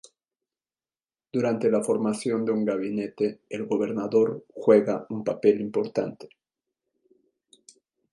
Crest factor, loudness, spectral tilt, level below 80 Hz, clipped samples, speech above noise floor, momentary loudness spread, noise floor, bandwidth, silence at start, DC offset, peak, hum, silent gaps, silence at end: 20 dB; -25 LUFS; -6.5 dB/octave; -74 dBFS; under 0.1%; over 65 dB; 10 LU; under -90 dBFS; 11.5 kHz; 1.35 s; under 0.1%; -6 dBFS; none; none; 1.85 s